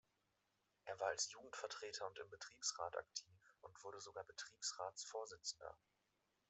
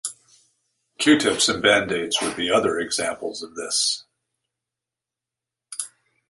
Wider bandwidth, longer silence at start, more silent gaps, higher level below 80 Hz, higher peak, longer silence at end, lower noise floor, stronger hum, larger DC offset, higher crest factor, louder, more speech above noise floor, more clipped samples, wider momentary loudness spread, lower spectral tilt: second, 8.2 kHz vs 11.5 kHz; first, 0.85 s vs 0.05 s; neither; second, -86 dBFS vs -60 dBFS; second, -28 dBFS vs -2 dBFS; first, 0.75 s vs 0.4 s; about the same, -86 dBFS vs -88 dBFS; neither; neither; about the same, 24 dB vs 22 dB; second, -49 LUFS vs -21 LUFS; second, 36 dB vs 66 dB; neither; about the same, 14 LU vs 15 LU; second, 0.5 dB/octave vs -2 dB/octave